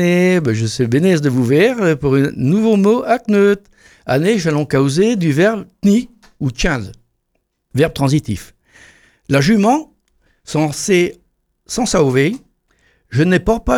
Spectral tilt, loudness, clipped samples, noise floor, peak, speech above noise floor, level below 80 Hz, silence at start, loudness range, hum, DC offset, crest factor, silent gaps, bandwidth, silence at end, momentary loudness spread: -6 dB/octave; -15 LUFS; under 0.1%; -68 dBFS; 0 dBFS; 54 dB; -36 dBFS; 0 s; 5 LU; none; under 0.1%; 14 dB; none; 16 kHz; 0 s; 10 LU